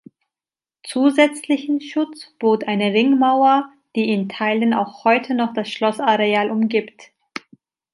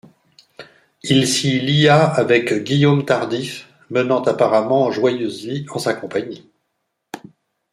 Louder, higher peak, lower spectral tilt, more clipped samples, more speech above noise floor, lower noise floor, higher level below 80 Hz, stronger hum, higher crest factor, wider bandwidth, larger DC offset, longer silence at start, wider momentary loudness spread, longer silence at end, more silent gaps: about the same, -19 LUFS vs -17 LUFS; about the same, -2 dBFS vs -2 dBFS; about the same, -5.5 dB/octave vs -5 dB/octave; neither; first, over 72 dB vs 57 dB; first, under -90 dBFS vs -73 dBFS; second, -72 dBFS vs -58 dBFS; neither; about the same, 18 dB vs 16 dB; second, 11.5 kHz vs 14.5 kHz; neither; first, 0.85 s vs 0.6 s; second, 12 LU vs 19 LU; first, 0.9 s vs 0.55 s; neither